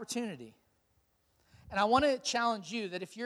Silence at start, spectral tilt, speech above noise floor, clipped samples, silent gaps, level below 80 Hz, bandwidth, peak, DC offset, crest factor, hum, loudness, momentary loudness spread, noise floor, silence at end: 0 s; -3.5 dB/octave; 41 dB; under 0.1%; none; -62 dBFS; 14.5 kHz; -12 dBFS; under 0.1%; 22 dB; none; -32 LUFS; 13 LU; -74 dBFS; 0 s